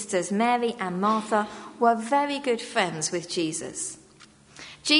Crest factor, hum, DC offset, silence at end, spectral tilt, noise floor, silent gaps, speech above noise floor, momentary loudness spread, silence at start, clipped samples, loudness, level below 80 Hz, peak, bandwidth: 20 dB; none; under 0.1%; 0 s; -3 dB/octave; -53 dBFS; none; 28 dB; 10 LU; 0 s; under 0.1%; -26 LUFS; -68 dBFS; -6 dBFS; 11 kHz